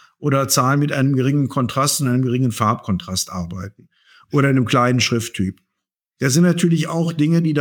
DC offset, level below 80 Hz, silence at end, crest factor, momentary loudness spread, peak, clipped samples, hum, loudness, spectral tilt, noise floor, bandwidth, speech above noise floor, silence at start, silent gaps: under 0.1%; -54 dBFS; 0 s; 16 dB; 9 LU; -2 dBFS; under 0.1%; none; -18 LUFS; -5 dB/octave; -80 dBFS; 20 kHz; 63 dB; 0.2 s; none